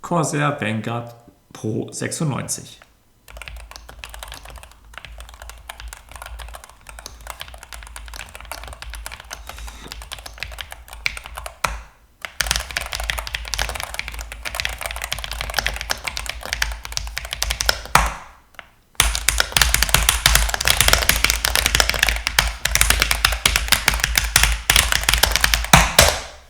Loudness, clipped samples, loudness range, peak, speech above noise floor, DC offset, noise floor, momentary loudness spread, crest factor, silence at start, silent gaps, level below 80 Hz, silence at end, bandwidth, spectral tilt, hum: -18 LUFS; under 0.1%; 21 LU; 0 dBFS; 24 dB; under 0.1%; -47 dBFS; 22 LU; 22 dB; 0 s; none; -30 dBFS; 0.1 s; over 20 kHz; -2 dB/octave; none